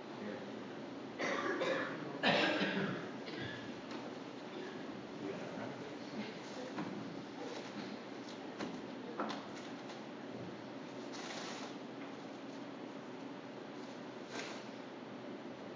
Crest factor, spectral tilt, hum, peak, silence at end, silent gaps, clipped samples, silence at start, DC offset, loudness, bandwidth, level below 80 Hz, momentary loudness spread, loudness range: 24 dB; -4.5 dB/octave; none; -20 dBFS; 0 s; none; under 0.1%; 0 s; under 0.1%; -43 LUFS; 7.6 kHz; -80 dBFS; 11 LU; 10 LU